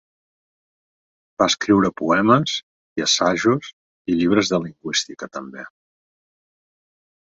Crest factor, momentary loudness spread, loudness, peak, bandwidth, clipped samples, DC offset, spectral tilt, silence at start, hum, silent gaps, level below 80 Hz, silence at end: 20 dB; 16 LU; -19 LUFS; -2 dBFS; 8 kHz; under 0.1%; under 0.1%; -4 dB/octave; 1.4 s; none; 2.63-2.96 s, 3.73-4.05 s; -56 dBFS; 1.6 s